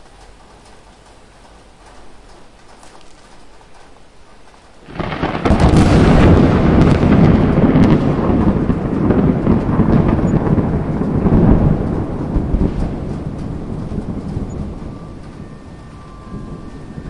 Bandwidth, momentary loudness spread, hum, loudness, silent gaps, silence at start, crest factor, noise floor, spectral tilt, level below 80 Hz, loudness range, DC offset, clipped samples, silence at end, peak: 11 kHz; 22 LU; none; -14 LUFS; none; 1.95 s; 14 dB; -42 dBFS; -8.5 dB/octave; -24 dBFS; 16 LU; under 0.1%; under 0.1%; 0 s; 0 dBFS